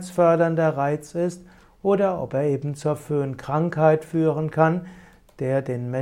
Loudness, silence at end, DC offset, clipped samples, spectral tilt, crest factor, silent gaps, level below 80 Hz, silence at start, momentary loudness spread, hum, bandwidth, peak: -23 LUFS; 0 s; under 0.1%; under 0.1%; -8 dB/octave; 18 dB; none; -58 dBFS; 0 s; 9 LU; none; 14.5 kHz; -4 dBFS